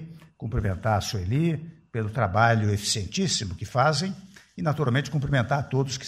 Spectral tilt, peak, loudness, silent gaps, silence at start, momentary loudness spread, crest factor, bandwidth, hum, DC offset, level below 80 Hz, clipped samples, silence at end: -5 dB/octave; -6 dBFS; -26 LUFS; none; 0 s; 12 LU; 20 dB; 14 kHz; none; under 0.1%; -46 dBFS; under 0.1%; 0 s